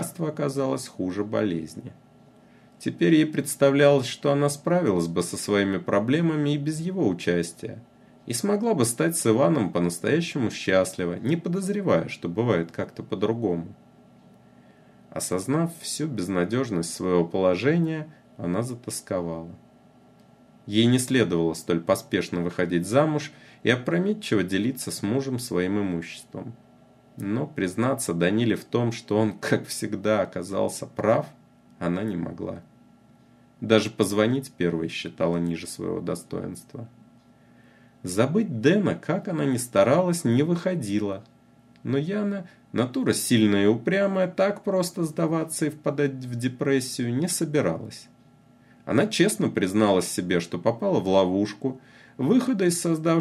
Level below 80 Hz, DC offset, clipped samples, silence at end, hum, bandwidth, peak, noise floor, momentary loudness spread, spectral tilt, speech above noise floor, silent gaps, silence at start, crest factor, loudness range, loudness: -64 dBFS; under 0.1%; under 0.1%; 0 s; none; 15 kHz; -4 dBFS; -55 dBFS; 12 LU; -5.5 dB/octave; 31 dB; none; 0 s; 20 dB; 5 LU; -25 LUFS